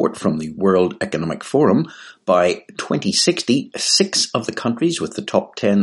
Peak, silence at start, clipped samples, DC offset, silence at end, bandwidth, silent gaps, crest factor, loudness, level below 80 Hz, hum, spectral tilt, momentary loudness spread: 0 dBFS; 0 s; under 0.1%; under 0.1%; 0 s; 11.5 kHz; none; 18 dB; -18 LUFS; -58 dBFS; none; -4 dB/octave; 8 LU